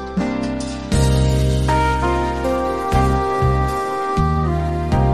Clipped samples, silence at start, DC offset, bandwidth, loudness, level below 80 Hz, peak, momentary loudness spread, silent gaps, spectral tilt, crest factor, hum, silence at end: under 0.1%; 0 s; 0.5%; 14 kHz; -19 LUFS; -24 dBFS; -4 dBFS; 5 LU; none; -6.5 dB/octave; 12 dB; none; 0 s